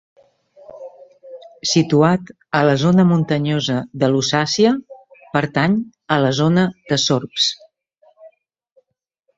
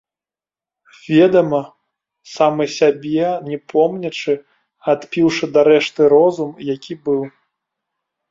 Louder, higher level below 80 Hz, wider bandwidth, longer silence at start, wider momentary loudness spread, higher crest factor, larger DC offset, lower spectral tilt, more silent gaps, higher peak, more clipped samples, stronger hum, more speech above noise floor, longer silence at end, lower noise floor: about the same, -17 LUFS vs -16 LUFS; first, -56 dBFS vs -62 dBFS; about the same, 7.8 kHz vs 7.6 kHz; second, 0.7 s vs 1.1 s; second, 9 LU vs 12 LU; about the same, 16 dB vs 16 dB; neither; about the same, -5 dB/octave vs -6 dB/octave; neither; about the same, -2 dBFS vs -2 dBFS; neither; neither; second, 53 dB vs over 74 dB; about the same, 1.1 s vs 1 s; second, -69 dBFS vs under -90 dBFS